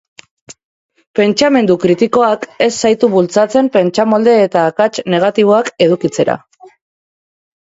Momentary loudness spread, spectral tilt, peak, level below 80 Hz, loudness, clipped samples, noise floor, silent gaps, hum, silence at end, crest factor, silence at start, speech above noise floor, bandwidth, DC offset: 5 LU; -5 dB/octave; 0 dBFS; -56 dBFS; -12 LUFS; under 0.1%; under -90 dBFS; 0.64-0.89 s, 1.07-1.14 s; none; 0.95 s; 12 dB; 0.5 s; over 79 dB; 8 kHz; under 0.1%